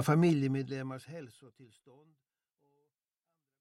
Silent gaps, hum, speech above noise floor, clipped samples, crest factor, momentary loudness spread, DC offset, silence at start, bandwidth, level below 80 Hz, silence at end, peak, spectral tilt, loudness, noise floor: none; none; 56 dB; under 0.1%; 20 dB; 21 LU; under 0.1%; 0 s; 15 kHz; -76 dBFS; 1.95 s; -16 dBFS; -7.5 dB/octave; -32 LUFS; -89 dBFS